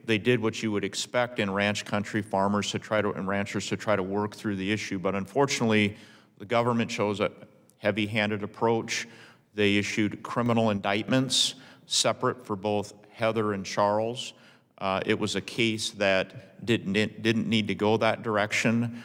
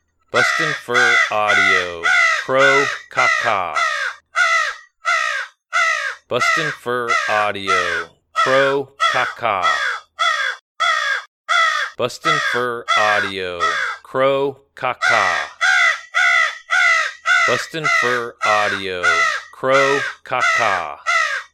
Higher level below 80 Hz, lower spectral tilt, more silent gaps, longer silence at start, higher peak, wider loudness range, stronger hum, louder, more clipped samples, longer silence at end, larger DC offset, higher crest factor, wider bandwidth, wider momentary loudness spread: second, -70 dBFS vs -62 dBFS; first, -4.5 dB/octave vs -2 dB/octave; second, none vs 10.61-10.75 s, 11.28-11.44 s; second, 0.05 s vs 0.35 s; second, -8 dBFS vs 0 dBFS; about the same, 2 LU vs 3 LU; neither; second, -27 LUFS vs -17 LUFS; neither; about the same, 0 s vs 0.1 s; neither; about the same, 20 dB vs 18 dB; about the same, 16.5 kHz vs 15 kHz; about the same, 7 LU vs 8 LU